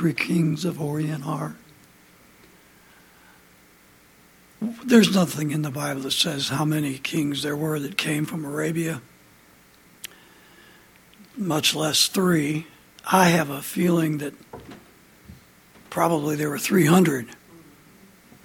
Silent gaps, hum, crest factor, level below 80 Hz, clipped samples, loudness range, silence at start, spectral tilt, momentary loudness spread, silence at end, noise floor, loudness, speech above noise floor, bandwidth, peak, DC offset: none; none; 22 dB; -62 dBFS; under 0.1%; 10 LU; 0 s; -4.5 dB/octave; 17 LU; 0.85 s; -54 dBFS; -23 LUFS; 32 dB; 18 kHz; -4 dBFS; under 0.1%